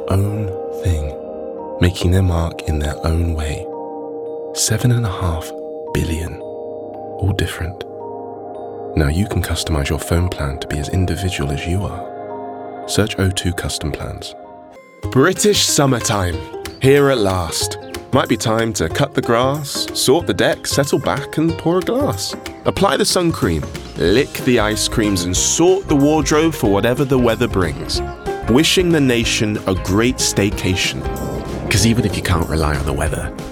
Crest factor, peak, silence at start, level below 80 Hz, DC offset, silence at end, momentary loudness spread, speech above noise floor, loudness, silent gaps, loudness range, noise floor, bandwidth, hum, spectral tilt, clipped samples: 16 dB; 0 dBFS; 0 s; -32 dBFS; under 0.1%; 0 s; 14 LU; 23 dB; -17 LUFS; none; 6 LU; -40 dBFS; 17.5 kHz; none; -4.5 dB/octave; under 0.1%